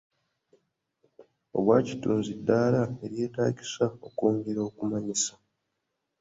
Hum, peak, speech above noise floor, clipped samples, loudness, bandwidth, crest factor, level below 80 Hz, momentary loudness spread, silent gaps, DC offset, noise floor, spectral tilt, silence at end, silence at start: none; -8 dBFS; 54 dB; under 0.1%; -28 LUFS; 8 kHz; 22 dB; -64 dBFS; 9 LU; none; under 0.1%; -81 dBFS; -5.5 dB/octave; 0.9 s; 1.2 s